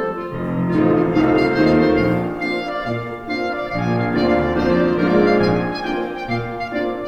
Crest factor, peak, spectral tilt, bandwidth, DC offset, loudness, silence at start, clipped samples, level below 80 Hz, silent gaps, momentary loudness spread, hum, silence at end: 16 dB; -2 dBFS; -8 dB/octave; 8.2 kHz; under 0.1%; -18 LUFS; 0 s; under 0.1%; -40 dBFS; none; 9 LU; none; 0 s